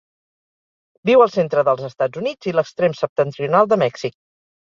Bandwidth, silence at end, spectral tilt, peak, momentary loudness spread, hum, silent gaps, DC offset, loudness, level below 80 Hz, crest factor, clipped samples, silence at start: 7.4 kHz; 0.6 s; -6.5 dB/octave; -2 dBFS; 10 LU; none; 3.09-3.16 s; under 0.1%; -18 LUFS; -64 dBFS; 18 dB; under 0.1%; 1.05 s